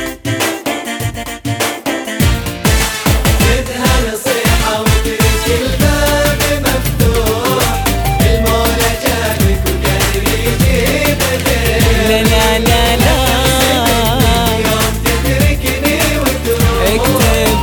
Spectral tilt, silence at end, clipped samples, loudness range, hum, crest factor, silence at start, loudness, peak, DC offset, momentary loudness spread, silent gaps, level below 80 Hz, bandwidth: -4 dB/octave; 0 s; under 0.1%; 3 LU; none; 12 dB; 0 s; -12 LUFS; 0 dBFS; under 0.1%; 5 LU; none; -18 dBFS; over 20 kHz